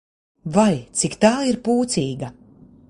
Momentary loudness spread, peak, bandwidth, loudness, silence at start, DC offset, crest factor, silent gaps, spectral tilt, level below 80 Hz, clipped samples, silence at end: 14 LU; -2 dBFS; 11.5 kHz; -20 LUFS; 0.45 s; under 0.1%; 20 dB; none; -5 dB/octave; -54 dBFS; under 0.1%; 0.6 s